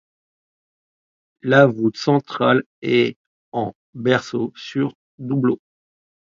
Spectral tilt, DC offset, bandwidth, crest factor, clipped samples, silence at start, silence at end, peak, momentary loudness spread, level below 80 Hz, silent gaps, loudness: -7 dB/octave; under 0.1%; 7.4 kHz; 20 dB; under 0.1%; 1.45 s; 0.75 s; 0 dBFS; 13 LU; -64 dBFS; 2.66-2.82 s, 3.16-3.52 s, 3.75-3.93 s, 4.95-5.18 s; -20 LUFS